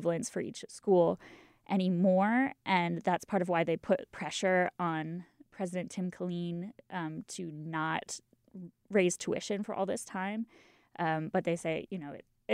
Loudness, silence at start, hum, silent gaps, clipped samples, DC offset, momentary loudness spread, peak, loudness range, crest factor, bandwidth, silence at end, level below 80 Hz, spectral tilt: -33 LUFS; 0 s; none; none; under 0.1%; under 0.1%; 14 LU; -16 dBFS; 8 LU; 18 dB; 14 kHz; 0 s; -74 dBFS; -5.5 dB/octave